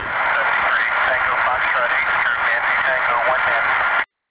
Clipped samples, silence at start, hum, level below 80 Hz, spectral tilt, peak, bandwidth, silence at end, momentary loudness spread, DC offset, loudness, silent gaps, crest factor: under 0.1%; 0 s; none; -50 dBFS; -5 dB/octave; -8 dBFS; 4 kHz; 0.25 s; 1 LU; 0.1%; -17 LUFS; none; 12 dB